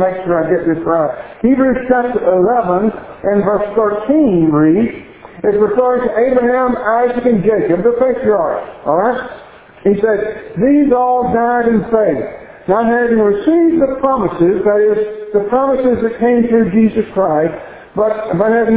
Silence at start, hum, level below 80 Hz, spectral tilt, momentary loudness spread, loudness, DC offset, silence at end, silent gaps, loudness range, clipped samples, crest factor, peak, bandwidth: 0 s; none; -44 dBFS; -11.5 dB/octave; 7 LU; -13 LUFS; under 0.1%; 0 s; none; 2 LU; under 0.1%; 12 dB; 0 dBFS; 4 kHz